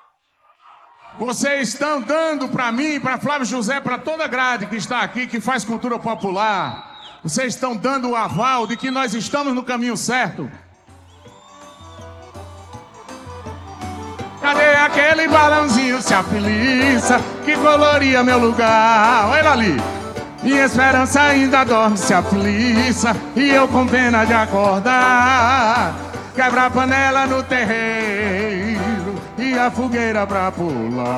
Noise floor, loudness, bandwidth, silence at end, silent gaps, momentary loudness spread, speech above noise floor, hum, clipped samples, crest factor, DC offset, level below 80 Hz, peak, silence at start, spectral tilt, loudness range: -59 dBFS; -16 LUFS; 14 kHz; 0 s; none; 12 LU; 42 dB; none; under 0.1%; 18 dB; under 0.1%; -46 dBFS; 0 dBFS; 1.05 s; -4 dB/octave; 8 LU